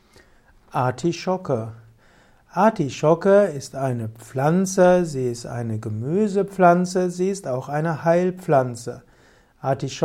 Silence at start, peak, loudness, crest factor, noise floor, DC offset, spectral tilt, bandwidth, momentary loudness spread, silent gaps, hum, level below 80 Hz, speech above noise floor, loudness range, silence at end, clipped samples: 0.75 s; -4 dBFS; -21 LUFS; 18 dB; -55 dBFS; under 0.1%; -6.5 dB/octave; 15.5 kHz; 13 LU; none; none; -56 dBFS; 34 dB; 3 LU; 0 s; under 0.1%